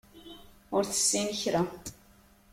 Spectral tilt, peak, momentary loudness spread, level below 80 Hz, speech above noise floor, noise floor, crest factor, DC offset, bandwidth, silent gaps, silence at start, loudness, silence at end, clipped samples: -3 dB/octave; -14 dBFS; 24 LU; -60 dBFS; 30 dB; -59 dBFS; 18 dB; under 0.1%; 16.5 kHz; none; 0.15 s; -28 LUFS; 0.6 s; under 0.1%